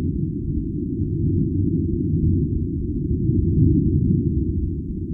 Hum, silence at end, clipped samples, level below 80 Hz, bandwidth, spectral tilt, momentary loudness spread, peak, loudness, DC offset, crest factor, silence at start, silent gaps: none; 0 s; under 0.1%; -28 dBFS; 0.5 kHz; -16.5 dB/octave; 8 LU; -6 dBFS; -22 LUFS; under 0.1%; 14 dB; 0 s; none